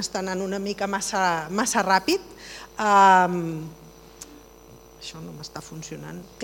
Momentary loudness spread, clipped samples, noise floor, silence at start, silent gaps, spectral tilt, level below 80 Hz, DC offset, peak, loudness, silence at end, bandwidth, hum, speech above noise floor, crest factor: 23 LU; under 0.1%; -48 dBFS; 0 s; none; -3.5 dB/octave; -56 dBFS; under 0.1%; -4 dBFS; -22 LUFS; 0 s; 19.5 kHz; none; 24 dB; 22 dB